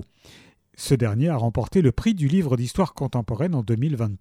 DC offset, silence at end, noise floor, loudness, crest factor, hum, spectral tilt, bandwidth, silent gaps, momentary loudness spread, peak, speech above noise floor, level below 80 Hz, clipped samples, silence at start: under 0.1%; 0.05 s; -52 dBFS; -23 LUFS; 16 dB; none; -7.5 dB/octave; 14.5 kHz; none; 4 LU; -6 dBFS; 30 dB; -42 dBFS; under 0.1%; 0 s